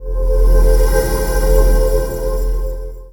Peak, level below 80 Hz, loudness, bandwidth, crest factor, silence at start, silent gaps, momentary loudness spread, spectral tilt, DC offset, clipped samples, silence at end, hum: 0 dBFS; -14 dBFS; -16 LUFS; 18.5 kHz; 12 dB; 0 s; none; 9 LU; -5.5 dB/octave; under 0.1%; under 0.1%; 0 s; none